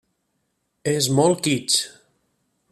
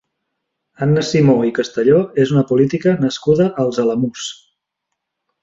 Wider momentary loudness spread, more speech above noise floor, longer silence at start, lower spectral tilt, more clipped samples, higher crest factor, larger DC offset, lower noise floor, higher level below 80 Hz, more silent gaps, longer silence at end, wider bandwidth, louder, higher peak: first, 11 LU vs 7 LU; second, 53 dB vs 62 dB; about the same, 0.85 s vs 0.8 s; second, -4 dB/octave vs -6.5 dB/octave; neither; first, 20 dB vs 14 dB; neither; second, -73 dBFS vs -77 dBFS; second, -62 dBFS vs -56 dBFS; neither; second, 0.85 s vs 1.1 s; first, 14.5 kHz vs 7.8 kHz; second, -20 LUFS vs -16 LUFS; about the same, -4 dBFS vs -2 dBFS